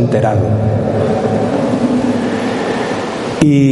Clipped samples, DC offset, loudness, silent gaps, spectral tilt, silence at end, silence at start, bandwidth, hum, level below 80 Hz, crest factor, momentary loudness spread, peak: under 0.1%; under 0.1%; -15 LUFS; none; -7.5 dB/octave; 0 s; 0 s; 11.5 kHz; none; -40 dBFS; 14 dB; 5 LU; 0 dBFS